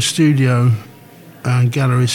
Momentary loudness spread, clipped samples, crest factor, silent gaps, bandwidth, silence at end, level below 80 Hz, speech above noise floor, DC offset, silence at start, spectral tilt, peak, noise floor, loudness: 8 LU; under 0.1%; 12 dB; none; 14 kHz; 0 s; -52 dBFS; 26 dB; under 0.1%; 0 s; -5.5 dB/octave; -2 dBFS; -40 dBFS; -15 LUFS